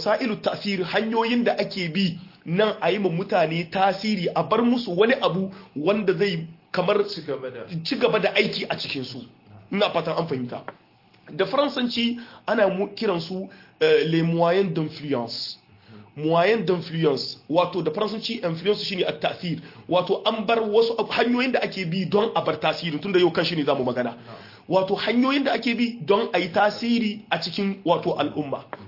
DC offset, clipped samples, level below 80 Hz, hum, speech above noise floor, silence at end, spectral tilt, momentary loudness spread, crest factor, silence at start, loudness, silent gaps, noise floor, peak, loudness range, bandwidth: under 0.1%; under 0.1%; -66 dBFS; none; 25 dB; 0 s; -6.5 dB/octave; 10 LU; 18 dB; 0 s; -23 LUFS; none; -48 dBFS; -6 dBFS; 3 LU; 5.8 kHz